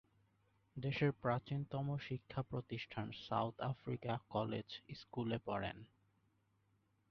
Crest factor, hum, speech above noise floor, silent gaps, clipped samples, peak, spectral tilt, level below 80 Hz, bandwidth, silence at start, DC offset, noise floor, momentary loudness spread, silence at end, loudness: 20 dB; none; 36 dB; none; under 0.1%; -24 dBFS; -5.5 dB/octave; -70 dBFS; 6.4 kHz; 0.75 s; under 0.1%; -79 dBFS; 9 LU; 1.25 s; -43 LUFS